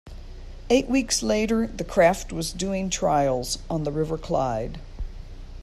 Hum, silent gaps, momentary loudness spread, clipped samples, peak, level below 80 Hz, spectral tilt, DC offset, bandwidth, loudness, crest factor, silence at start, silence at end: none; none; 22 LU; under 0.1%; -6 dBFS; -38 dBFS; -4.5 dB/octave; under 0.1%; 14 kHz; -24 LUFS; 20 dB; 0.05 s; 0 s